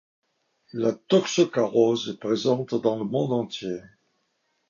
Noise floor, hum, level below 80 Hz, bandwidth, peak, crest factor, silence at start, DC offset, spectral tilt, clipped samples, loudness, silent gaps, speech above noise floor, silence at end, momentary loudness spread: -73 dBFS; none; -70 dBFS; 7.4 kHz; -6 dBFS; 18 dB; 0.75 s; under 0.1%; -5.5 dB/octave; under 0.1%; -24 LUFS; none; 49 dB; 0.9 s; 11 LU